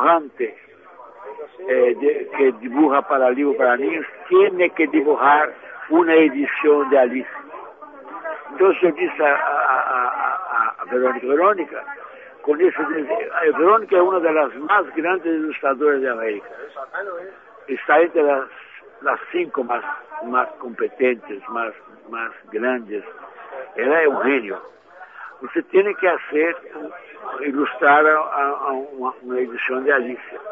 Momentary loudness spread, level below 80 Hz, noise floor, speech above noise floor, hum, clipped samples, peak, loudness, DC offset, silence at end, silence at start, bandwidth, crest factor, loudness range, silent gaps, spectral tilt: 19 LU; -78 dBFS; -43 dBFS; 24 dB; none; under 0.1%; -4 dBFS; -19 LUFS; under 0.1%; 0 s; 0 s; 3.8 kHz; 16 dB; 6 LU; none; -7.5 dB/octave